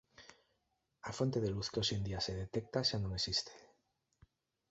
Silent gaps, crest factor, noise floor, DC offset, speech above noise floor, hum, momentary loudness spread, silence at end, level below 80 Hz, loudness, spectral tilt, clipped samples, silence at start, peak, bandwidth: none; 20 dB; -83 dBFS; under 0.1%; 45 dB; none; 8 LU; 1.05 s; -58 dBFS; -37 LUFS; -4.5 dB/octave; under 0.1%; 0.2 s; -20 dBFS; 8 kHz